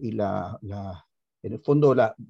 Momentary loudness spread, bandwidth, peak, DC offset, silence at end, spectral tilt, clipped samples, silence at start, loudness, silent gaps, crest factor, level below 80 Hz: 20 LU; 7.4 kHz; -8 dBFS; under 0.1%; 0.05 s; -9 dB/octave; under 0.1%; 0 s; -24 LUFS; none; 18 dB; -64 dBFS